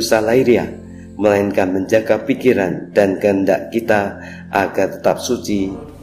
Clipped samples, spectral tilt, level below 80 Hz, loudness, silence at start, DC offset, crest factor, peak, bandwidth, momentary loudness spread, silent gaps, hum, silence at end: under 0.1%; -5.5 dB/octave; -50 dBFS; -17 LUFS; 0 s; 0.1%; 16 dB; 0 dBFS; 16 kHz; 9 LU; none; none; 0 s